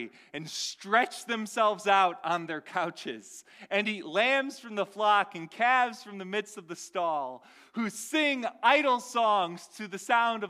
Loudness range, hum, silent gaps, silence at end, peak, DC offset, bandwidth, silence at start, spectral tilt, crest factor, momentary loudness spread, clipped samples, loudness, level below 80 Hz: 2 LU; none; none; 0 s; -10 dBFS; under 0.1%; 15.5 kHz; 0 s; -3 dB/octave; 20 dB; 16 LU; under 0.1%; -28 LUFS; -86 dBFS